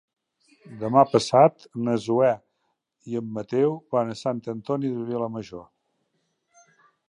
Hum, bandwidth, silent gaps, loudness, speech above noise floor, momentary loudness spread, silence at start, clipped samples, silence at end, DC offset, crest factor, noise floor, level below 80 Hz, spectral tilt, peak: none; 11 kHz; none; -24 LUFS; 52 dB; 14 LU; 0.7 s; under 0.1%; 1.45 s; under 0.1%; 22 dB; -75 dBFS; -68 dBFS; -6.5 dB/octave; -4 dBFS